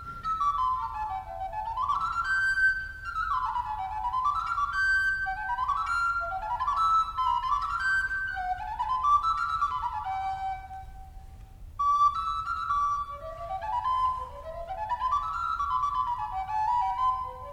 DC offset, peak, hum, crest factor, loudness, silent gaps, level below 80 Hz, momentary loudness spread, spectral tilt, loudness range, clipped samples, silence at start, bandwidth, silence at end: under 0.1%; -14 dBFS; none; 14 dB; -28 LUFS; none; -48 dBFS; 11 LU; -2.5 dB/octave; 3 LU; under 0.1%; 0 s; 15.5 kHz; 0 s